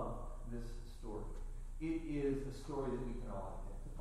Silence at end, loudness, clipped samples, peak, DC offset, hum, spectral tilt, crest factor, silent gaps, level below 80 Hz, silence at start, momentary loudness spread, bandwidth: 0 s; -45 LUFS; under 0.1%; -28 dBFS; under 0.1%; 60 Hz at -65 dBFS; -7.5 dB/octave; 14 dB; none; -46 dBFS; 0 s; 13 LU; 12 kHz